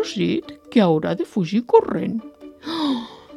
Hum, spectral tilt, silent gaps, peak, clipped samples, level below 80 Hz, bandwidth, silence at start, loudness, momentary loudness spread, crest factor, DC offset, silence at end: none; -7 dB/octave; none; 0 dBFS; under 0.1%; -62 dBFS; 11.5 kHz; 0 s; -21 LUFS; 11 LU; 20 dB; under 0.1%; 0 s